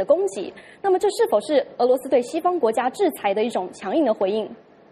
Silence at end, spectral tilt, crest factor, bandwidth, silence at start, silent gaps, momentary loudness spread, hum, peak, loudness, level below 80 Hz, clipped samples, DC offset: 0.35 s; -4.5 dB/octave; 16 dB; 14.5 kHz; 0 s; none; 8 LU; none; -6 dBFS; -22 LUFS; -68 dBFS; under 0.1%; under 0.1%